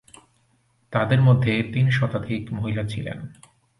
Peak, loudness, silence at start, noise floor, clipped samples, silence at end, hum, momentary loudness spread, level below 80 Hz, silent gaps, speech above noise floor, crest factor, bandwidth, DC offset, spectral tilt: -6 dBFS; -22 LUFS; 0.9 s; -64 dBFS; under 0.1%; 0.5 s; none; 15 LU; -50 dBFS; none; 43 dB; 18 dB; 11 kHz; under 0.1%; -7.5 dB/octave